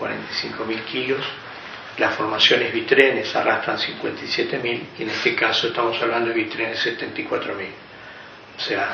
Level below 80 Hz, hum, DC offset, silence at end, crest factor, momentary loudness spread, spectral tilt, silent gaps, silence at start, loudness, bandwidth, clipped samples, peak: -64 dBFS; none; under 0.1%; 0 s; 22 dB; 18 LU; -1 dB/octave; none; 0 s; -21 LUFS; 6.8 kHz; under 0.1%; 0 dBFS